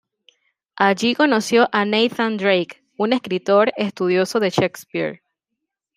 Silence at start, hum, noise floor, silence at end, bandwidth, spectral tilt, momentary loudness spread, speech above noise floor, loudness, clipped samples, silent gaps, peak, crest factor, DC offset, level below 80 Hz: 0.75 s; none; -80 dBFS; 0.8 s; 15.5 kHz; -4.5 dB/octave; 9 LU; 62 dB; -19 LUFS; under 0.1%; none; -2 dBFS; 18 dB; under 0.1%; -66 dBFS